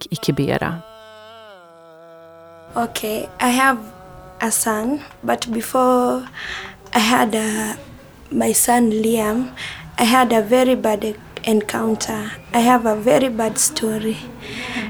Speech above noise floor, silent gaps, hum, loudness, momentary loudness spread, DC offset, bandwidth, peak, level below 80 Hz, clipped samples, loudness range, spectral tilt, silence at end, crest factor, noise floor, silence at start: 25 dB; none; none; -18 LUFS; 13 LU; under 0.1%; over 20 kHz; 0 dBFS; -48 dBFS; under 0.1%; 6 LU; -3.5 dB/octave; 0 s; 18 dB; -44 dBFS; 0 s